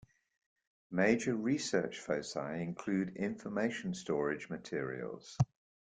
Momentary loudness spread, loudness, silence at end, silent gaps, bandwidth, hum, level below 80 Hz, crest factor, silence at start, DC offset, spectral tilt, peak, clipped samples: 9 LU; -36 LUFS; 0.5 s; none; 9.6 kHz; none; -68 dBFS; 22 dB; 0.9 s; under 0.1%; -5.5 dB/octave; -16 dBFS; under 0.1%